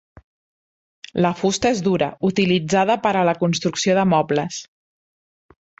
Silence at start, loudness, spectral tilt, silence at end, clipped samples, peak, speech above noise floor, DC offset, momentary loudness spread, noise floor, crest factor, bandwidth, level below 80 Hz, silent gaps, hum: 1.15 s; -19 LUFS; -5 dB/octave; 1.15 s; under 0.1%; -4 dBFS; over 71 dB; under 0.1%; 5 LU; under -90 dBFS; 16 dB; 8 kHz; -54 dBFS; none; none